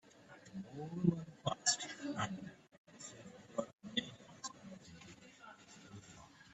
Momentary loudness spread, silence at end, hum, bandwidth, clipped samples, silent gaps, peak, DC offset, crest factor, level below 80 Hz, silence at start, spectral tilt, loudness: 21 LU; 0 s; none; 8.6 kHz; under 0.1%; 2.78-2.85 s, 3.73-3.78 s; -18 dBFS; under 0.1%; 26 dB; -74 dBFS; 0.05 s; -3.5 dB/octave; -41 LUFS